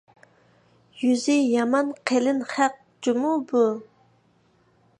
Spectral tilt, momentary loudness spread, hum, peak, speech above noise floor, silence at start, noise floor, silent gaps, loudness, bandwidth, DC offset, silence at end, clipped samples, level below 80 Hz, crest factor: -4 dB/octave; 5 LU; none; -6 dBFS; 40 dB; 0.95 s; -62 dBFS; none; -23 LUFS; 10.5 kHz; under 0.1%; 1.15 s; under 0.1%; -78 dBFS; 20 dB